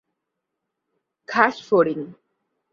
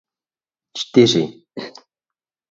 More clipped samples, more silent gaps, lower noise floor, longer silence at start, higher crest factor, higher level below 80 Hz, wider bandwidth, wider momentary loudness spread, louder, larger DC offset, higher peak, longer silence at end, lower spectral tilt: neither; neither; second, -81 dBFS vs under -90 dBFS; first, 1.3 s vs 0.75 s; about the same, 24 dB vs 20 dB; second, -72 dBFS vs -64 dBFS; about the same, 7.4 kHz vs 7.8 kHz; second, 13 LU vs 20 LU; second, -20 LUFS vs -17 LUFS; neither; about the same, 0 dBFS vs 0 dBFS; second, 0.6 s vs 0.8 s; about the same, -6 dB/octave vs -5 dB/octave